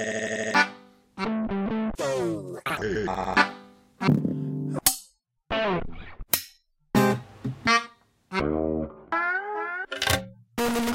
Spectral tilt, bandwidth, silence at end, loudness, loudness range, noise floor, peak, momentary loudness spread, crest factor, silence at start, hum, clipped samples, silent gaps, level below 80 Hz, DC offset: -4 dB/octave; 16.5 kHz; 0 s; -27 LUFS; 1 LU; -57 dBFS; -4 dBFS; 9 LU; 24 dB; 0 s; none; under 0.1%; none; -48 dBFS; under 0.1%